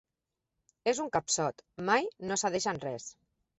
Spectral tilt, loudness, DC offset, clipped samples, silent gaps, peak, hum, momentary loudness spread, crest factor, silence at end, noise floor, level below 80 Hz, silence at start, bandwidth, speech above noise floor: -3 dB/octave; -32 LUFS; under 0.1%; under 0.1%; none; -14 dBFS; none; 10 LU; 20 dB; 0.45 s; -88 dBFS; -68 dBFS; 0.85 s; 8.2 kHz; 56 dB